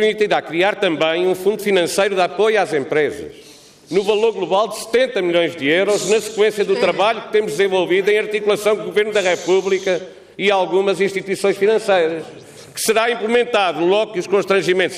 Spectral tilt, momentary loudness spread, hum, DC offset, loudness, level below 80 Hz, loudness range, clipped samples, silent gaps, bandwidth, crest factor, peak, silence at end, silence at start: -3.5 dB/octave; 4 LU; none; under 0.1%; -17 LUFS; -62 dBFS; 2 LU; under 0.1%; none; 15.5 kHz; 12 dB; -4 dBFS; 0 s; 0 s